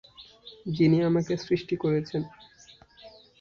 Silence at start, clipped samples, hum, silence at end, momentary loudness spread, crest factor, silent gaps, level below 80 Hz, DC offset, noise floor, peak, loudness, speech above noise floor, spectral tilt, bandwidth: 0.2 s; under 0.1%; none; 0.3 s; 19 LU; 16 dB; none; -60 dBFS; under 0.1%; -55 dBFS; -12 dBFS; -26 LUFS; 29 dB; -7.5 dB/octave; 7.2 kHz